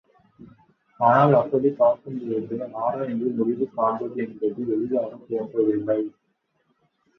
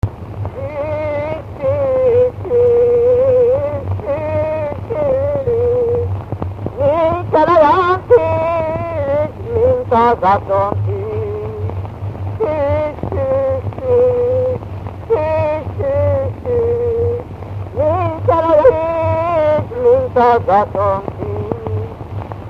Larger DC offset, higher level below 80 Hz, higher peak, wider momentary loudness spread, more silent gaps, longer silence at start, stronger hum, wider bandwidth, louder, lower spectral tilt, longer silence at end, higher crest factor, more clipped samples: neither; second, -66 dBFS vs -36 dBFS; second, -4 dBFS vs 0 dBFS; about the same, 11 LU vs 12 LU; neither; first, 0.4 s vs 0.05 s; neither; about the same, 6 kHz vs 5.8 kHz; second, -23 LUFS vs -15 LUFS; about the same, -10 dB/octave vs -9 dB/octave; first, 1.1 s vs 0 s; first, 20 dB vs 14 dB; neither